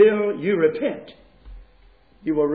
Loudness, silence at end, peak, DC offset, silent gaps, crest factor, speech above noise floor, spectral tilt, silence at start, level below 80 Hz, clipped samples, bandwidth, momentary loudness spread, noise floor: -22 LUFS; 0 s; -6 dBFS; under 0.1%; none; 16 dB; 32 dB; -10.5 dB/octave; 0 s; -50 dBFS; under 0.1%; 4.8 kHz; 13 LU; -54 dBFS